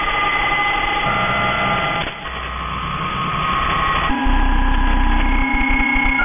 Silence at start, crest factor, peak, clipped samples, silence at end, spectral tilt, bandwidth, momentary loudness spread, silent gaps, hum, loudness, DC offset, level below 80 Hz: 0 s; 12 dB; -6 dBFS; under 0.1%; 0 s; -8 dB/octave; 3.7 kHz; 7 LU; none; none; -18 LUFS; under 0.1%; -22 dBFS